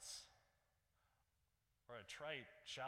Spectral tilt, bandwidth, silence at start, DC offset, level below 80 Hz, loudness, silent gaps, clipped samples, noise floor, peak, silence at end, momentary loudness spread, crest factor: -1.5 dB/octave; 16 kHz; 0 s; under 0.1%; -84 dBFS; -53 LUFS; none; under 0.1%; -85 dBFS; -36 dBFS; 0 s; 10 LU; 22 dB